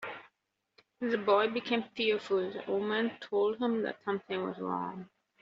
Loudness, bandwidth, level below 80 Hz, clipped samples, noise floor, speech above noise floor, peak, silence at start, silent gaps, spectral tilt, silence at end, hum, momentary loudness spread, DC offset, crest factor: -32 LUFS; 7.6 kHz; -78 dBFS; under 0.1%; -81 dBFS; 49 dB; -14 dBFS; 0 s; none; -3 dB/octave; 0.35 s; none; 10 LU; under 0.1%; 18 dB